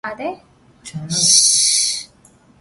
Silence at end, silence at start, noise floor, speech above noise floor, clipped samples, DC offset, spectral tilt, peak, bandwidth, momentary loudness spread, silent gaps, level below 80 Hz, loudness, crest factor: 0.55 s; 0.05 s; -51 dBFS; 34 dB; under 0.1%; under 0.1%; -0.5 dB/octave; 0 dBFS; 12 kHz; 20 LU; none; -58 dBFS; -12 LUFS; 20 dB